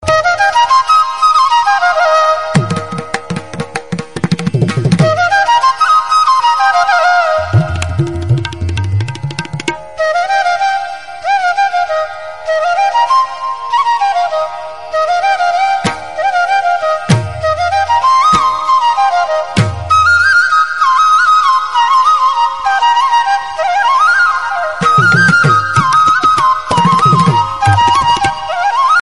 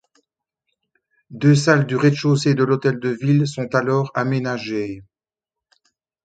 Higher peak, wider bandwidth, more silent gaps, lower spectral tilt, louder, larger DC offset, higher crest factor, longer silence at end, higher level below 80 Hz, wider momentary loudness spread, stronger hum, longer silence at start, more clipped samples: about the same, 0 dBFS vs 0 dBFS; first, 11.5 kHz vs 9.2 kHz; neither; second, -5 dB/octave vs -6.5 dB/octave; first, -11 LUFS vs -19 LUFS; first, 1% vs under 0.1%; second, 12 dB vs 20 dB; second, 0 s vs 1.25 s; first, -40 dBFS vs -60 dBFS; about the same, 10 LU vs 9 LU; neither; second, 0 s vs 1.3 s; neither